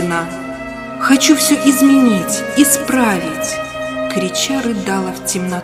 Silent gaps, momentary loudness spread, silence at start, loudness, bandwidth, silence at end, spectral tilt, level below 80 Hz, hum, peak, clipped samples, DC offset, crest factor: none; 12 LU; 0 s; -14 LUFS; 16 kHz; 0 s; -3.5 dB/octave; -46 dBFS; none; 0 dBFS; under 0.1%; under 0.1%; 14 dB